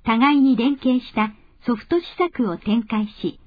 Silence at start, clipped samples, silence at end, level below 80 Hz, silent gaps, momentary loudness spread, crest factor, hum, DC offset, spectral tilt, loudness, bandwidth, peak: 0.05 s; under 0.1%; 0.15 s; -52 dBFS; none; 10 LU; 16 dB; none; under 0.1%; -8.5 dB/octave; -21 LUFS; 5 kHz; -4 dBFS